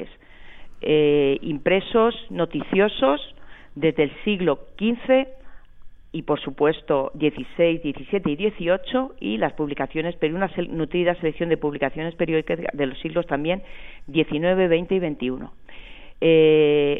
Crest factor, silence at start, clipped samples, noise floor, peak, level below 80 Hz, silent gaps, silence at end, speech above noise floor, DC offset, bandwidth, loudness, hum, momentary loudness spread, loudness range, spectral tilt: 18 dB; 0 s; under 0.1%; -42 dBFS; -4 dBFS; -46 dBFS; none; 0 s; 20 dB; under 0.1%; 4 kHz; -22 LUFS; none; 9 LU; 3 LU; -9 dB/octave